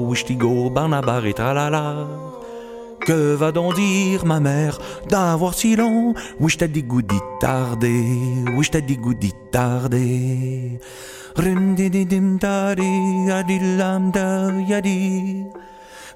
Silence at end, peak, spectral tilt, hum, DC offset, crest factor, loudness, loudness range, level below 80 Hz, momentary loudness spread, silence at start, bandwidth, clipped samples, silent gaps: 0 s; -2 dBFS; -6 dB/octave; none; under 0.1%; 16 dB; -20 LUFS; 2 LU; -44 dBFS; 11 LU; 0 s; 16 kHz; under 0.1%; none